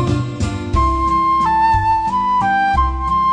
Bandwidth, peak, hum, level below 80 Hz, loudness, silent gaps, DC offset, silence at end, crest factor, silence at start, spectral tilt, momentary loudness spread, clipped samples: 10 kHz; -4 dBFS; none; -26 dBFS; -16 LUFS; none; under 0.1%; 0 s; 12 dB; 0 s; -6 dB/octave; 5 LU; under 0.1%